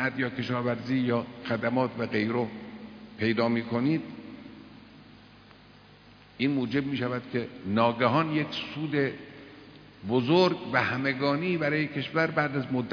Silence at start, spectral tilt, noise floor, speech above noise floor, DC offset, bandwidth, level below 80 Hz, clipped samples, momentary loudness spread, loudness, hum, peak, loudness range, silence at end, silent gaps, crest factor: 0 s; -7.5 dB/octave; -54 dBFS; 26 dB; under 0.1%; 5.4 kHz; -64 dBFS; under 0.1%; 19 LU; -28 LUFS; 50 Hz at -55 dBFS; -8 dBFS; 6 LU; 0 s; none; 20 dB